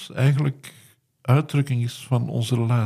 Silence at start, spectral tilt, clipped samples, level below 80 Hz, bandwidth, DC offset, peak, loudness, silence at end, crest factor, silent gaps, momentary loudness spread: 0 s; -7 dB/octave; under 0.1%; -62 dBFS; 14 kHz; under 0.1%; -4 dBFS; -23 LUFS; 0 s; 18 dB; none; 12 LU